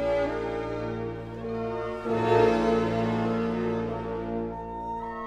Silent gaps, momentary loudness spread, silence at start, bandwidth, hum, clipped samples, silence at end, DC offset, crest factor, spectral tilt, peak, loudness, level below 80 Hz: none; 12 LU; 0 s; 9.6 kHz; none; under 0.1%; 0 s; under 0.1%; 18 dB; -7.5 dB/octave; -8 dBFS; -28 LUFS; -46 dBFS